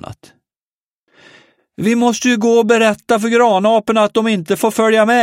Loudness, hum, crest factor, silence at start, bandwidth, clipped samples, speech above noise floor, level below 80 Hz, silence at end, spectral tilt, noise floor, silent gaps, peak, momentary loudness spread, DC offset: -13 LUFS; none; 14 dB; 0.05 s; 16 kHz; under 0.1%; over 77 dB; -58 dBFS; 0 s; -4.5 dB/octave; under -90 dBFS; 0.62-1.07 s; -2 dBFS; 5 LU; under 0.1%